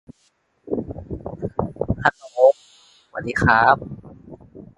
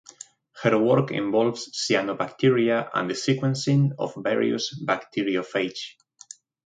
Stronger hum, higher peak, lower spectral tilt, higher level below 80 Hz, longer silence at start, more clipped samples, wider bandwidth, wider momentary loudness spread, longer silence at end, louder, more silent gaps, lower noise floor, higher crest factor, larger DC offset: neither; first, 0 dBFS vs -6 dBFS; about the same, -6.5 dB/octave vs -5.5 dB/octave; first, -42 dBFS vs -68 dBFS; about the same, 0.65 s vs 0.55 s; neither; first, 11 kHz vs 9.4 kHz; about the same, 19 LU vs 17 LU; second, 0.15 s vs 0.75 s; first, -20 LUFS vs -24 LUFS; neither; first, -65 dBFS vs -48 dBFS; about the same, 22 dB vs 18 dB; neither